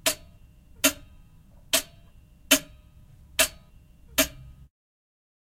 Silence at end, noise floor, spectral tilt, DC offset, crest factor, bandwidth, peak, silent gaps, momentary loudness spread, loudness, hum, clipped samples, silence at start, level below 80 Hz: 1.05 s; -53 dBFS; -0.5 dB/octave; under 0.1%; 26 dB; 16 kHz; -4 dBFS; none; 12 LU; -25 LUFS; none; under 0.1%; 0.05 s; -52 dBFS